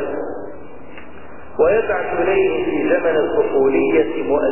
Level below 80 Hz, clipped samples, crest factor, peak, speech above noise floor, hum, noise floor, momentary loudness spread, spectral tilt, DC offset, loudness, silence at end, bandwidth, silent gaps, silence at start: -46 dBFS; under 0.1%; 16 dB; -4 dBFS; 22 dB; none; -39 dBFS; 22 LU; -10 dB/octave; 3%; -17 LUFS; 0 s; 3.1 kHz; none; 0 s